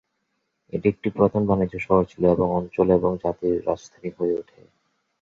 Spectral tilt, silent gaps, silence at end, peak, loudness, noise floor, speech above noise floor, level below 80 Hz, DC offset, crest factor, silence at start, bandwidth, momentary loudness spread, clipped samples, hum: -9 dB/octave; none; 0.8 s; -4 dBFS; -23 LUFS; -75 dBFS; 53 dB; -48 dBFS; under 0.1%; 18 dB; 0.75 s; 7.4 kHz; 9 LU; under 0.1%; none